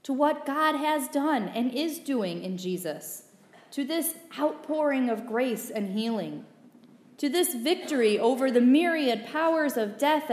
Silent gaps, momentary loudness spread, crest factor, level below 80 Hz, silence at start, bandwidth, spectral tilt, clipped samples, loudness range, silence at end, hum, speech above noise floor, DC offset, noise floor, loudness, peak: none; 10 LU; 16 dB; -88 dBFS; 0.05 s; 15.5 kHz; -4 dB/octave; under 0.1%; 6 LU; 0 s; none; 28 dB; under 0.1%; -54 dBFS; -27 LUFS; -10 dBFS